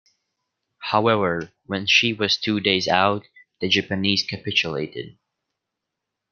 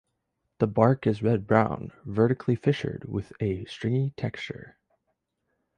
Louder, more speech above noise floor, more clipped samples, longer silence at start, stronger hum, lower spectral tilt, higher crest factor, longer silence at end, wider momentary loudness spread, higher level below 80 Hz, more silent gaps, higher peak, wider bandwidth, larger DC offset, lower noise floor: first, -21 LUFS vs -27 LUFS; first, 61 dB vs 53 dB; neither; first, 0.8 s vs 0.6 s; neither; second, -4 dB/octave vs -8.5 dB/octave; about the same, 22 dB vs 22 dB; about the same, 1.2 s vs 1.1 s; about the same, 13 LU vs 12 LU; second, -62 dBFS vs -54 dBFS; neither; about the same, -2 dBFS vs -4 dBFS; second, 7 kHz vs 9.4 kHz; neither; first, -83 dBFS vs -79 dBFS